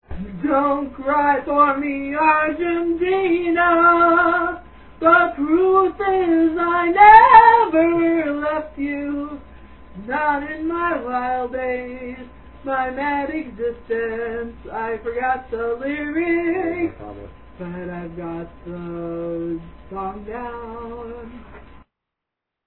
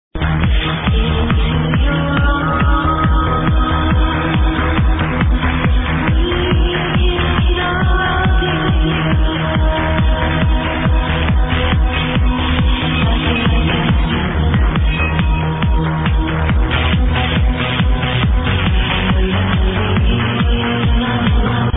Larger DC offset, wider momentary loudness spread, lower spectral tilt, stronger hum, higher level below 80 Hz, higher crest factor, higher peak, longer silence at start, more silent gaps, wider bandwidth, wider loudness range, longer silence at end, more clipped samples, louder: first, 0.3% vs under 0.1%; first, 19 LU vs 1 LU; about the same, -9.5 dB/octave vs -10 dB/octave; neither; second, -46 dBFS vs -18 dBFS; first, 20 dB vs 14 dB; about the same, 0 dBFS vs 0 dBFS; about the same, 0.1 s vs 0.15 s; neither; about the same, 4.2 kHz vs 4 kHz; first, 17 LU vs 1 LU; first, 1.05 s vs 0 s; neither; second, -18 LUFS vs -15 LUFS